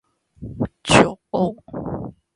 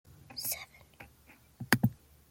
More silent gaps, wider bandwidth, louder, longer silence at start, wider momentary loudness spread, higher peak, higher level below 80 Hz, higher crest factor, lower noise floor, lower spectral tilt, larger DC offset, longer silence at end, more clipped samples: neither; second, 11.5 kHz vs 17 kHz; first, -20 LUFS vs -33 LUFS; about the same, 0.4 s vs 0.3 s; second, 18 LU vs 25 LU; first, 0 dBFS vs -6 dBFS; first, -44 dBFS vs -62 dBFS; second, 22 dB vs 32 dB; second, -38 dBFS vs -61 dBFS; about the same, -4.5 dB/octave vs -4 dB/octave; neither; about the same, 0.25 s vs 0.35 s; neither